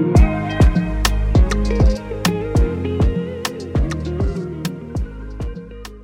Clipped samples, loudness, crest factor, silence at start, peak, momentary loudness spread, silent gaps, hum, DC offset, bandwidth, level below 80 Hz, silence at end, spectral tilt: under 0.1%; -20 LUFS; 14 dB; 0 s; -4 dBFS; 14 LU; none; none; under 0.1%; 16.5 kHz; -20 dBFS; 0 s; -6.5 dB/octave